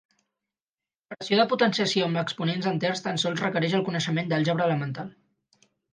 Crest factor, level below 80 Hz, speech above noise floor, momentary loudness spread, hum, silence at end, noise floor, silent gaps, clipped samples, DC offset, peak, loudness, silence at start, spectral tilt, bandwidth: 18 dB; -72 dBFS; over 65 dB; 11 LU; none; 0.8 s; under -90 dBFS; none; under 0.1%; under 0.1%; -8 dBFS; -25 LUFS; 1.1 s; -5 dB/octave; 9.8 kHz